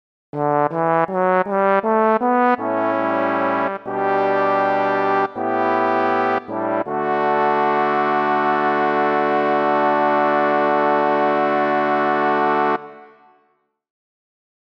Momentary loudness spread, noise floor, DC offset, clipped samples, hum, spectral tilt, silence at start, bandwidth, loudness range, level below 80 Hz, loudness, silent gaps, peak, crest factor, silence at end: 4 LU; -65 dBFS; under 0.1%; under 0.1%; none; -7.5 dB/octave; 0.35 s; 6.6 kHz; 2 LU; -72 dBFS; -18 LUFS; none; -4 dBFS; 14 dB; 1.7 s